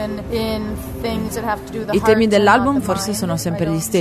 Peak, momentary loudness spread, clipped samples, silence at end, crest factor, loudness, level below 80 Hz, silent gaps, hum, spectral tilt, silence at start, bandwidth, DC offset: 0 dBFS; 11 LU; under 0.1%; 0 s; 18 dB; -18 LUFS; -36 dBFS; none; none; -5 dB/octave; 0 s; 13.5 kHz; under 0.1%